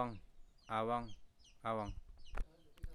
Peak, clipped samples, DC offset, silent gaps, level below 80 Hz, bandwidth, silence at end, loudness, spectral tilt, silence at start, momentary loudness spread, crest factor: -24 dBFS; under 0.1%; under 0.1%; none; -52 dBFS; 11.5 kHz; 0 s; -43 LUFS; -6.5 dB/octave; 0 s; 18 LU; 20 dB